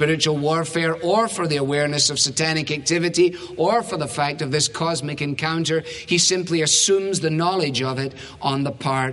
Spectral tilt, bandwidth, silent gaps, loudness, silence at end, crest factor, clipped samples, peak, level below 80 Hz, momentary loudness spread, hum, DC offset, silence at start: -3.5 dB/octave; 11.5 kHz; none; -20 LUFS; 0 s; 16 dB; under 0.1%; -4 dBFS; -56 dBFS; 7 LU; none; under 0.1%; 0 s